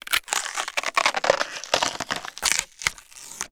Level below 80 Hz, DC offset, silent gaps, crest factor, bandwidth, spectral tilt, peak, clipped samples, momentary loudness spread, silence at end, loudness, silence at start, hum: -56 dBFS; under 0.1%; none; 26 dB; over 20 kHz; 0 dB/octave; 0 dBFS; under 0.1%; 8 LU; 0.05 s; -24 LUFS; 0.05 s; none